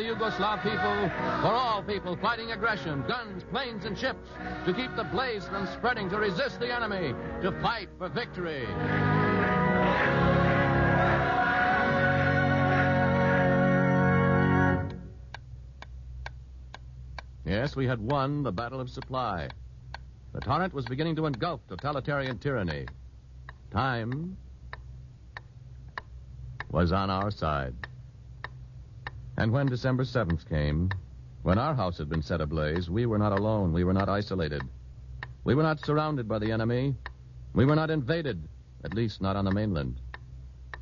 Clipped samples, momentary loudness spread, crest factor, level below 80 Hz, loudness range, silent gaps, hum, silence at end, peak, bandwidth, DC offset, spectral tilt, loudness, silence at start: under 0.1%; 21 LU; 18 dB; -46 dBFS; 9 LU; none; none; 0 s; -12 dBFS; 7.2 kHz; under 0.1%; -8 dB/octave; -28 LUFS; 0 s